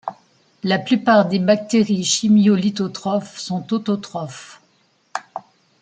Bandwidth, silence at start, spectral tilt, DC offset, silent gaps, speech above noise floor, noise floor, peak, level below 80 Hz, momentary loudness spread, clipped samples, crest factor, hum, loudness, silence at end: 9.4 kHz; 0.05 s; -5 dB/octave; under 0.1%; none; 43 dB; -61 dBFS; -2 dBFS; -66 dBFS; 18 LU; under 0.1%; 18 dB; none; -18 LUFS; 0.4 s